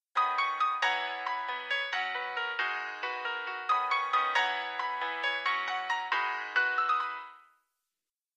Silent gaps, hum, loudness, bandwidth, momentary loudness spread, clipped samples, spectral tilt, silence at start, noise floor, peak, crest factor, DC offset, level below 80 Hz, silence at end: none; none; -30 LUFS; 9.6 kHz; 7 LU; under 0.1%; 1 dB/octave; 0.15 s; under -90 dBFS; -14 dBFS; 18 dB; under 0.1%; under -90 dBFS; 0.95 s